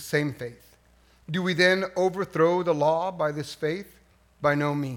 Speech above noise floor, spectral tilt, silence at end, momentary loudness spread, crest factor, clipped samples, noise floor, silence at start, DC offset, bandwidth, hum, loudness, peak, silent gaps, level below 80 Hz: 34 dB; -5.5 dB/octave; 0 s; 11 LU; 20 dB; under 0.1%; -59 dBFS; 0 s; under 0.1%; 18 kHz; none; -25 LUFS; -6 dBFS; none; -62 dBFS